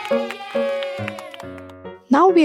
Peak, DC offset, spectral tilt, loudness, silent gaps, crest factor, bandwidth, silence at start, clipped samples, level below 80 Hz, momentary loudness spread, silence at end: -4 dBFS; under 0.1%; -6 dB/octave; -21 LUFS; none; 16 dB; 14 kHz; 0 s; under 0.1%; -68 dBFS; 21 LU; 0 s